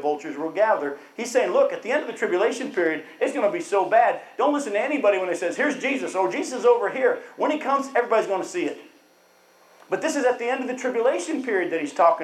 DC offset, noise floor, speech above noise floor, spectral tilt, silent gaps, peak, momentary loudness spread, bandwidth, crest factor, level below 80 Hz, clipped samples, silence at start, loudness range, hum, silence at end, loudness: under 0.1%; -57 dBFS; 34 dB; -3.5 dB/octave; none; -6 dBFS; 7 LU; 13 kHz; 18 dB; -84 dBFS; under 0.1%; 0 s; 4 LU; none; 0 s; -23 LUFS